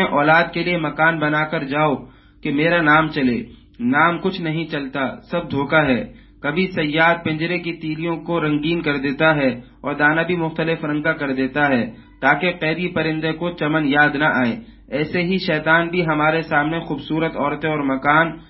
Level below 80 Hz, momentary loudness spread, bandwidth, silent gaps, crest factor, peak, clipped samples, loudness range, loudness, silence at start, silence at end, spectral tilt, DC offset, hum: -48 dBFS; 9 LU; 5.8 kHz; none; 18 dB; 0 dBFS; under 0.1%; 2 LU; -19 LUFS; 0 s; 0.05 s; -11 dB/octave; under 0.1%; none